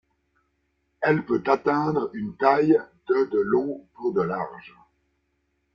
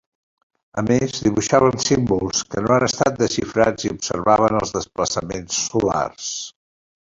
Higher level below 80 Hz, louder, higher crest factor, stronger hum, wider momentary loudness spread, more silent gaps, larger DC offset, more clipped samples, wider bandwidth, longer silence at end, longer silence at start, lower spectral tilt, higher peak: second, -64 dBFS vs -46 dBFS; second, -24 LUFS vs -20 LUFS; about the same, 20 dB vs 18 dB; neither; about the same, 10 LU vs 9 LU; neither; neither; neither; second, 6.8 kHz vs 8 kHz; first, 1.05 s vs 0.6 s; first, 1 s vs 0.75 s; first, -8.5 dB/octave vs -4.5 dB/octave; about the same, -4 dBFS vs -2 dBFS